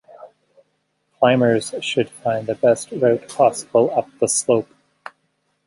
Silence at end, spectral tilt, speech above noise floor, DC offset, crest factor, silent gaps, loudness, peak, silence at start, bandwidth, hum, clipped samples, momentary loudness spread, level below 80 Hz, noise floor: 1.05 s; -4.5 dB/octave; 51 dB; under 0.1%; 18 dB; none; -19 LUFS; -2 dBFS; 0.2 s; 11.5 kHz; none; under 0.1%; 6 LU; -64 dBFS; -69 dBFS